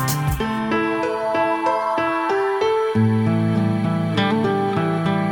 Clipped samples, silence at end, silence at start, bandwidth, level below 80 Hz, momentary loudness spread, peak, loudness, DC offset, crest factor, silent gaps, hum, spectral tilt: under 0.1%; 0 s; 0 s; 17 kHz; -42 dBFS; 3 LU; -6 dBFS; -20 LUFS; under 0.1%; 14 dB; none; none; -6.5 dB/octave